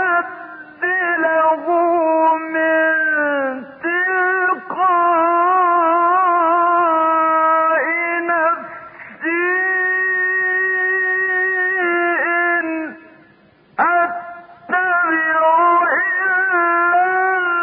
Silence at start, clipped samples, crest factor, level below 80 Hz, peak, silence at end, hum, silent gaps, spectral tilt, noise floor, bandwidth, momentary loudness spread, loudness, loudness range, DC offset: 0 s; under 0.1%; 12 dB; -70 dBFS; -4 dBFS; 0 s; none; none; -8.5 dB/octave; -51 dBFS; 4 kHz; 8 LU; -16 LUFS; 3 LU; under 0.1%